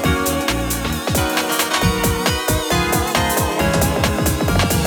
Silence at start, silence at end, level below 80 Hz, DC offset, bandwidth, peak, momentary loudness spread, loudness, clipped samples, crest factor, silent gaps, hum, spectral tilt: 0 s; 0 s; -30 dBFS; under 0.1%; over 20 kHz; -2 dBFS; 3 LU; -18 LUFS; under 0.1%; 16 dB; none; none; -4 dB/octave